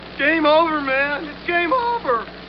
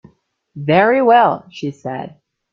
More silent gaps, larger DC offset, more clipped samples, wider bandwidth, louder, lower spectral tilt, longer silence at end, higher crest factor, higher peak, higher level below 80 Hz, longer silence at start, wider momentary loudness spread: neither; first, 0.1% vs under 0.1%; neither; second, 6 kHz vs 7.4 kHz; second, -19 LUFS vs -14 LUFS; second, -1.5 dB/octave vs -7.5 dB/octave; second, 0 s vs 0.45 s; about the same, 14 dB vs 16 dB; second, -6 dBFS vs -2 dBFS; first, -50 dBFS vs -60 dBFS; second, 0 s vs 0.55 s; second, 7 LU vs 17 LU